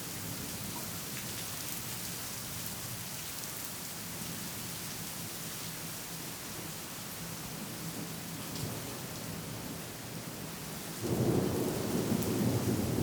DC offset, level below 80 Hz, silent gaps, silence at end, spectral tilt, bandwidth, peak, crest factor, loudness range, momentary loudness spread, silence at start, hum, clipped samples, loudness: under 0.1%; -60 dBFS; none; 0 s; -4 dB/octave; over 20 kHz; -14 dBFS; 22 dB; 5 LU; 9 LU; 0 s; none; under 0.1%; -37 LUFS